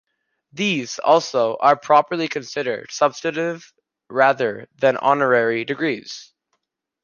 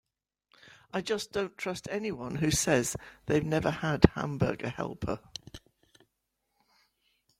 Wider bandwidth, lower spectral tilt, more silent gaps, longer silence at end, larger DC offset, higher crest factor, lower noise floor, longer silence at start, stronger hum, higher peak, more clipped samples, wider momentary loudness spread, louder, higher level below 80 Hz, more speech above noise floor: second, 7.2 kHz vs 16.5 kHz; about the same, -4 dB/octave vs -5 dB/octave; neither; second, 0.8 s vs 1.8 s; neither; second, 20 dB vs 30 dB; second, -74 dBFS vs -81 dBFS; second, 0.55 s vs 0.95 s; neither; about the same, -2 dBFS vs -2 dBFS; neither; second, 10 LU vs 13 LU; first, -20 LUFS vs -30 LUFS; second, -72 dBFS vs -48 dBFS; about the same, 54 dB vs 51 dB